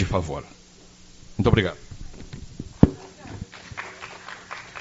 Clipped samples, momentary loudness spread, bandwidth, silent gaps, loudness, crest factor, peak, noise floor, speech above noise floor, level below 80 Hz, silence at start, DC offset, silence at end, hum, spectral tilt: under 0.1%; 21 LU; 8 kHz; none; -25 LUFS; 26 dB; 0 dBFS; -49 dBFS; 26 dB; -40 dBFS; 0 s; under 0.1%; 0 s; none; -6 dB/octave